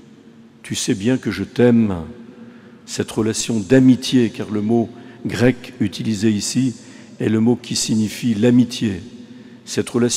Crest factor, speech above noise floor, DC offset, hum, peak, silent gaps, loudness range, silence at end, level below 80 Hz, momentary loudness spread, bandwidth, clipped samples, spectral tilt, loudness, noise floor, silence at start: 18 dB; 27 dB; under 0.1%; none; -2 dBFS; none; 3 LU; 0 s; -52 dBFS; 14 LU; 15 kHz; under 0.1%; -5 dB/octave; -18 LUFS; -45 dBFS; 0.65 s